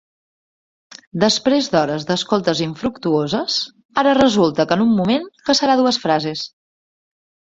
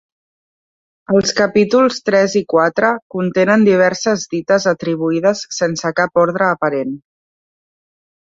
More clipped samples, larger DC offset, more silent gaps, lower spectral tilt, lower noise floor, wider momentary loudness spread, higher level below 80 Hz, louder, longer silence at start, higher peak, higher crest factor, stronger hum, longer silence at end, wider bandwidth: neither; neither; about the same, 3.85-3.89 s vs 3.02-3.10 s; about the same, -4.5 dB/octave vs -5 dB/octave; about the same, under -90 dBFS vs under -90 dBFS; about the same, 9 LU vs 7 LU; about the same, -54 dBFS vs -56 dBFS; about the same, -17 LUFS vs -15 LUFS; about the same, 1.15 s vs 1.1 s; about the same, 0 dBFS vs -2 dBFS; about the same, 18 dB vs 14 dB; neither; second, 1.1 s vs 1.35 s; about the same, 7.8 kHz vs 7.8 kHz